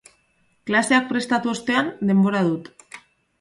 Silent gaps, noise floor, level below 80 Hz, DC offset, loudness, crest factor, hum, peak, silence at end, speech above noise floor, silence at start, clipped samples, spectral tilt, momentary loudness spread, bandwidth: none; -64 dBFS; -64 dBFS; under 0.1%; -21 LUFS; 18 dB; none; -4 dBFS; 0.4 s; 44 dB; 0.65 s; under 0.1%; -5 dB/octave; 17 LU; 11.5 kHz